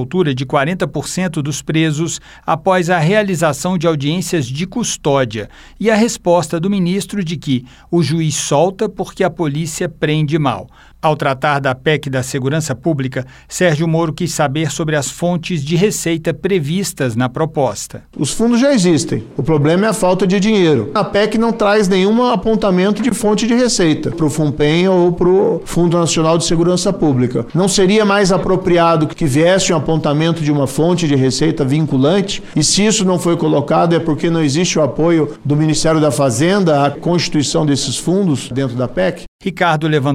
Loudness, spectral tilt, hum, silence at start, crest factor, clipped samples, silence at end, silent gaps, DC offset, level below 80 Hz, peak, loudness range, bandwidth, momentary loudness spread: -15 LUFS; -5 dB/octave; none; 0 s; 12 dB; under 0.1%; 0 s; 39.28-39.39 s; under 0.1%; -38 dBFS; -2 dBFS; 4 LU; 16 kHz; 7 LU